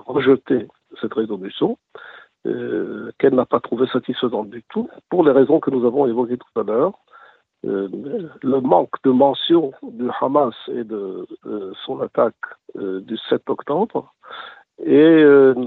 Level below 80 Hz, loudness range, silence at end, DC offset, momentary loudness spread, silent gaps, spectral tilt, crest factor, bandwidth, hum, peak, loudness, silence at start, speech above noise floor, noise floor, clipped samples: -66 dBFS; 6 LU; 0 s; under 0.1%; 16 LU; none; -9.5 dB/octave; 18 dB; 4.2 kHz; none; 0 dBFS; -19 LUFS; 0.1 s; 31 dB; -49 dBFS; under 0.1%